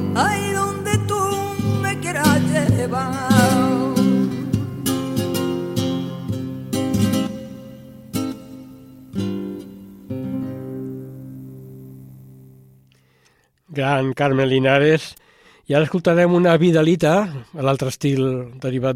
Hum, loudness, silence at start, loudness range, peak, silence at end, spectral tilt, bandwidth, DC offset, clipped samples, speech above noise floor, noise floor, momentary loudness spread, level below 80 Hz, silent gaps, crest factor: none; -20 LUFS; 0 s; 14 LU; -2 dBFS; 0 s; -6 dB/octave; 17 kHz; under 0.1%; under 0.1%; 43 dB; -60 dBFS; 20 LU; -52 dBFS; none; 20 dB